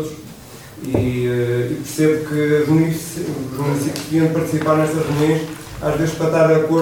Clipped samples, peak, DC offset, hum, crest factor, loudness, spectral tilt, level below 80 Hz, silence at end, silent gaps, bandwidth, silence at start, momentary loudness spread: under 0.1%; -2 dBFS; 0.1%; none; 16 dB; -18 LUFS; -6.5 dB/octave; -44 dBFS; 0 s; none; 17.5 kHz; 0 s; 13 LU